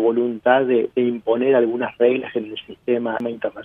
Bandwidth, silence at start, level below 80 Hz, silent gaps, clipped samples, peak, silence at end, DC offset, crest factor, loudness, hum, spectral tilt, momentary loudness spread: 3.8 kHz; 0 s; -64 dBFS; none; under 0.1%; -2 dBFS; 0 s; under 0.1%; 18 dB; -20 LUFS; none; -8.5 dB/octave; 10 LU